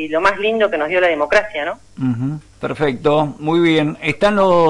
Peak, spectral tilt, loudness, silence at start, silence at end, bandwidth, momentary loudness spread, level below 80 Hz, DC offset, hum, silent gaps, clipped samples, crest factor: -4 dBFS; -6.5 dB/octave; -17 LUFS; 0 s; 0 s; 11.5 kHz; 10 LU; -46 dBFS; under 0.1%; none; none; under 0.1%; 12 dB